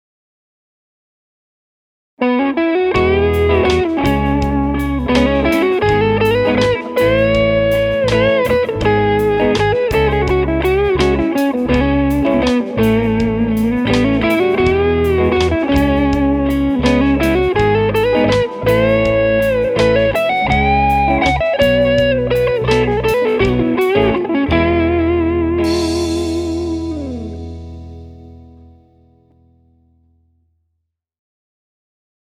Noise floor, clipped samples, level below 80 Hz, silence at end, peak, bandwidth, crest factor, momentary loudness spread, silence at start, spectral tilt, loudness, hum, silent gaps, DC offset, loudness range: -73 dBFS; under 0.1%; -28 dBFS; 3.85 s; 0 dBFS; over 20 kHz; 14 dB; 4 LU; 2.2 s; -6.5 dB/octave; -14 LUFS; none; none; under 0.1%; 5 LU